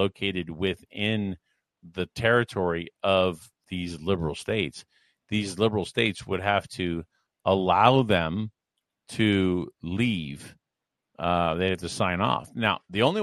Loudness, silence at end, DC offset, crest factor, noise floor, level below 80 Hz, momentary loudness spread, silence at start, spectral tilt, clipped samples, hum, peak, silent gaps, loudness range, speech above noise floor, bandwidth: -26 LUFS; 0 s; under 0.1%; 24 dB; -85 dBFS; -54 dBFS; 12 LU; 0 s; -5.5 dB/octave; under 0.1%; none; -2 dBFS; none; 4 LU; 60 dB; 13 kHz